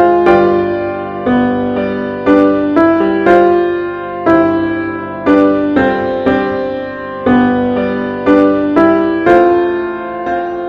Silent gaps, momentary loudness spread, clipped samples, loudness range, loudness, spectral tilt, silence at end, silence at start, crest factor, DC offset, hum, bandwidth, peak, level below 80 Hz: none; 9 LU; 0.4%; 2 LU; -12 LUFS; -8 dB/octave; 0 s; 0 s; 12 dB; under 0.1%; none; 5.8 kHz; 0 dBFS; -42 dBFS